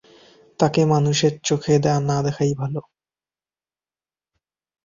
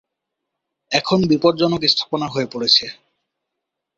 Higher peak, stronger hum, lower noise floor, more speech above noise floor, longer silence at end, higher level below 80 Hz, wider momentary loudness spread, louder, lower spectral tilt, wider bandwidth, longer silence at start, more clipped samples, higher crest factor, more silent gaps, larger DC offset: about the same, -2 dBFS vs -2 dBFS; neither; first, under -90 dBFS vs -80 dBFS; first, over 71 dB vs 63 dB; first, 2.05 s vs 1.05 s; about the same, -56 dBFS vs -56 dBFS; about the same, 8 LU vs 8 LU; second, -20 LUFS vs -17 LUFS; about the same, -5.5 dB/octave vs -4.5 dB/octave; about the same, 7.6 kHz vs 7.8 kHz; second, 0.6 s vs 0.9 s; neither; about the same, 20 dB vs 20 dB; neither; neither